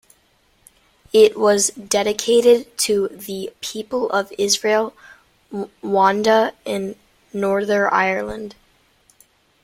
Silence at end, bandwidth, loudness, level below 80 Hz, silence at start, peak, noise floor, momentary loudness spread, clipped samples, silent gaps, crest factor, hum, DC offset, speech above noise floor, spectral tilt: 1.1 s; 16.5 kHz; -18 LUFS; -58 dBFS; 1.15 s; -2 dBFS; -60 dBFS; 15 LU; under 0.1%; none; 18 dB; none; under 0.1%; 41 dB; -3 dB/octave